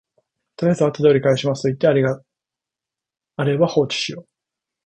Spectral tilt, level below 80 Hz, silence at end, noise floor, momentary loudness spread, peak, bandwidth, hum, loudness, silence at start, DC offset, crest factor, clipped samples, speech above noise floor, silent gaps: -6 dB/octave; -60 dBFS; 0.65 s; -87 dBFS; 11 LU; -2 dBFS; 9.4 kHz; none; -19 LUFS; 0.6 s; under 0.1%; 18 dB; under 0.1%; 69 dB; none